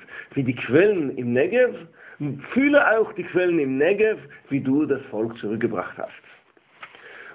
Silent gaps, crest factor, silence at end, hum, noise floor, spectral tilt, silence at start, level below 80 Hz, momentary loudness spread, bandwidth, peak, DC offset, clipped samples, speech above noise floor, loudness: none; 18 dB; 0 s; none; -47 dBFS; -10.5 dB/octave; 0.1 s; -62 dBFS; 15 LU; 4 kHz; -4 dBFS; under 0.1%; under 0.1%; 25 dB; -22 LUFS